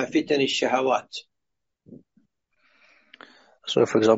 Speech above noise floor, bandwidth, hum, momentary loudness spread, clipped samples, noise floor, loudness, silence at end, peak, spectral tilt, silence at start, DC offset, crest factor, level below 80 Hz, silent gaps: 62 dB; 8 kHz; none; 17 LU; under 0.1%; -84 dBFS; -23 LUFS; 0 s; -6 dBFS; -3 dB/octave; 0 s; under 0.1%; 20 dB; -70 dBFS; none